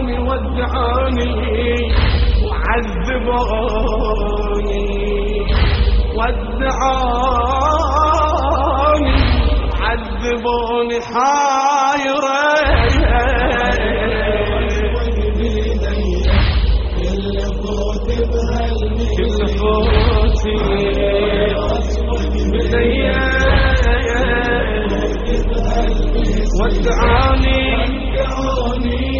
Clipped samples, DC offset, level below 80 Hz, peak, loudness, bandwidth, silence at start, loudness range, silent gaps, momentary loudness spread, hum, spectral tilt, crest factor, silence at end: under 0.1%; under 0.1%; -18 dBFS; 0 dBFS; -17 LUFS; 7.2 kHz; 0 s; 3 LU; none; 5 LU; none; -4.5 dB/octave; 14 dB; 0 s